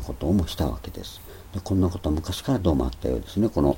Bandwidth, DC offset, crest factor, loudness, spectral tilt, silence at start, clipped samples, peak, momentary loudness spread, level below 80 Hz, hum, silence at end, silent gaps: 17 kHz; under 0.1%; 18 dB; -26 LUFS; -7 dB/octave; 0 s; under 0.1%; -8 dBFS; 14 LU; -34 dBFS; none; 0 s; none